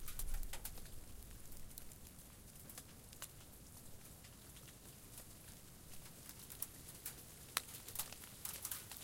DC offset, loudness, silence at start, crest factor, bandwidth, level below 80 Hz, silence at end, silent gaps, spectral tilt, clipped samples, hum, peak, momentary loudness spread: under 0.1%; -51 LUFS; 0 s; 36 dB; 17 kHz; -54 dBFS; 0 s; none; -2 dB/octave; under 0.1%; none; -14 dBFS; 12 LU